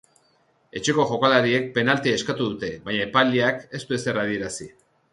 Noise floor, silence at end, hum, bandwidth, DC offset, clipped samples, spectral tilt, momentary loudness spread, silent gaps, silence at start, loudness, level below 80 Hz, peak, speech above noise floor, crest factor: -63 dBFS; 0.45 s; none; 11.5 kHz; under 0.1%; under 0.1%; -4.5 dB/octave; 13 LU; none; 0.75 s; -22 LUFS; -58 dBFS; -4 dBFS; 41 dB; 20 dB